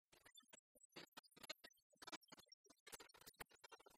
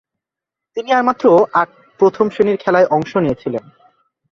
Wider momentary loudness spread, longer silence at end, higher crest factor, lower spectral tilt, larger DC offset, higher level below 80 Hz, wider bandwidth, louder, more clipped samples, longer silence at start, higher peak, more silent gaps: second, 10 LU vs 13 LU; second, 0 s vs 0.7 s; first, 26 dB vs 14 dB; second, -1 dB/octave vs -7 dB/octave; neither; second, -90 dBFS vs -52 dBFS; first, 15.5 kHz vs 7.2 kHz; second, -62 LUFS vs -15 LUFS; neither; second, 0.1 s vs 0.75 s; second, -38 dBFS vs -2 dBFS; first, 0.59-0.75 s, 0.85-0.90 s, 1.08-1.12 s, 1.82-1.90 s, 2.17-2.21 s, 2.54-2.64 s, 2.80-2.86 s vs none